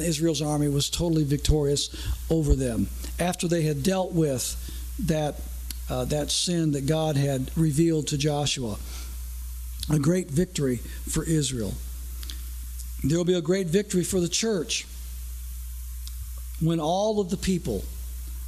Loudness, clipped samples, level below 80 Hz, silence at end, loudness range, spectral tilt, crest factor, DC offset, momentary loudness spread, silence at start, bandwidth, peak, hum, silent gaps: -26 LUFS; under 0.1%; -36 dBFS; 0 s; 3 LU; -5 dB/octave; 16 dB; under 0.1%; 13 LU; 0 s; 15 kHz; -10 dBFS; none; none